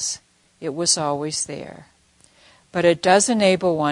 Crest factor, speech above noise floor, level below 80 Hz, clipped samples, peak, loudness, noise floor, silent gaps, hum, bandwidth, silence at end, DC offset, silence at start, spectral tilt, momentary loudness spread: 20 dB; 37 dB; -62 dBFS; under 0.1%; -2 dBFS; -19 LUFS; -56 dBFS; none; none; 11 kHz; 0 s; under 0.1%; 0 s; -3 dB/octave; 17 LU